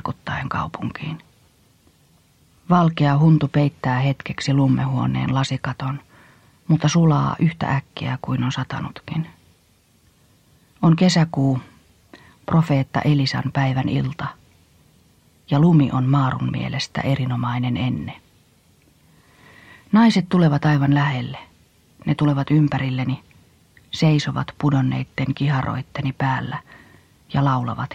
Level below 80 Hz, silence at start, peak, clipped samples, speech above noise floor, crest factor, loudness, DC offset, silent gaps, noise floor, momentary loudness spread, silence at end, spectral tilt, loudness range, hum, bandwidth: -52 dBFS; 0.05 s; -4 dBFS; under 0.1%; 39 dB; 18 dB; -20 LUFS; under 0.1%; none; -58 dBFS; 13 LU; 0 s; -7 dB/octave; 4 LU; none; 8.6 kHz